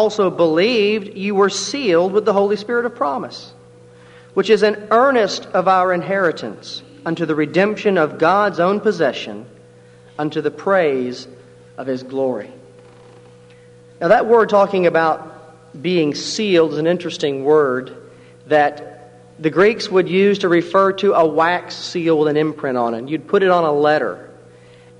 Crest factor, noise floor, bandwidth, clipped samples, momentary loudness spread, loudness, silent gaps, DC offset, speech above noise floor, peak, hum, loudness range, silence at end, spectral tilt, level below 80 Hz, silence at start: 16 dB; -45 dBFS; 10.5 kHz; under 0.1%; 12 LU; -17 LUFS; none; under 0.1%; 28 dB; 0 dBFS; none; 6 LU; 0.75 s; -5 dB/octave; -64 dBFS; 0 s